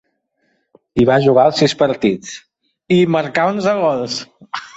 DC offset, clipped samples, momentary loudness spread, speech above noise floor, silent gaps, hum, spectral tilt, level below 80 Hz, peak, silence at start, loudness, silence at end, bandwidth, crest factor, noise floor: under 0.1%; under 0.1%; 15 LU; 51 dB; none; none; -5.5 dB/octave; -48 dBFS; -2 dBFS; 0.95 s; -15 LUFS; 0.1 s; 8.2 kHz; 14 dB; -66 dBFS